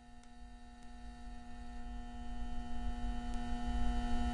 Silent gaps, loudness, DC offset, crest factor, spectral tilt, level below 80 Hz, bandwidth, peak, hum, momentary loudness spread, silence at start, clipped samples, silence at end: none; -44 LUFS; under 0.1%; 16 dB; -6 dB/octave; -42 dBFS; 10.5 kHz; -22 dBFS; none; 17 LU; 0 s; under 0.1%; 0 s